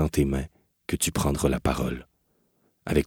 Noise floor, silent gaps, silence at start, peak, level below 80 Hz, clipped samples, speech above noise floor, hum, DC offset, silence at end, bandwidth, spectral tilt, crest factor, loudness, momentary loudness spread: -70 dBFS; none; 0 s; -8 dBFS; -38 dBFS; under 0.1%; 44 dB; none; under 0.1%; 0 s; 18 kHz; -5 dB/octave; 20 dB; -27 LUFS; 16 LU